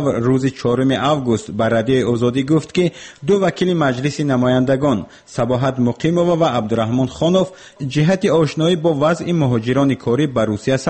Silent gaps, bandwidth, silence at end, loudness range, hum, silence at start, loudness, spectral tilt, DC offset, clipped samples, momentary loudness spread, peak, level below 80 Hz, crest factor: none; 8.8 kHz; 0 s; 1 LU; none; 0 s; -17 LUFS; -6.5 dB/octave; under 0.1%; under 0.1%; 4 LU; -4 dBFS; -48 dBFS; 12 dB